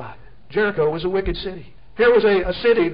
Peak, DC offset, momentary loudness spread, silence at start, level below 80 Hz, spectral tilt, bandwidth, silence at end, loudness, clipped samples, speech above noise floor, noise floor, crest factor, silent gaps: -6 dBFS; 1%; 20 LU; 0 s; -38 dBFS; -10.5 dB/octave; 5.4 kHz; 0 s; -19 LUFS; under 0.1%; 22 dB; -40 dBFS; 14 dB; none